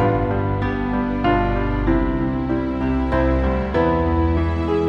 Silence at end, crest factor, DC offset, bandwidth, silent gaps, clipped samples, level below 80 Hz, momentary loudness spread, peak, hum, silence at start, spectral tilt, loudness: 0 s; 14 dB; under 0.1%; 6.6 kHz; none; under 0.1%; -26 dBFS; 3 LU; -6 dBFS; none; 0 s; -9.5 dB/octave; -20 LUFS